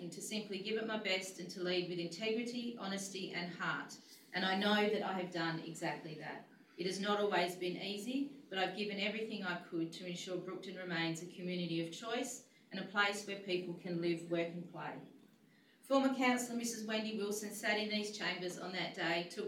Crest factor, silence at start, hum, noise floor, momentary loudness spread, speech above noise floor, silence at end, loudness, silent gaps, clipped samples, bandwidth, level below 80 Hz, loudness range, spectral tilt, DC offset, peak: 20 dB; 0 s; none; -68 dBFS; 11 LU; 28 dB; 0 s; -39 LUFS; none; under 0.1%; 16 kHz; under -90 dBFS; 3 LU; -4 dB/octave; under 0.1%; -20 dBFS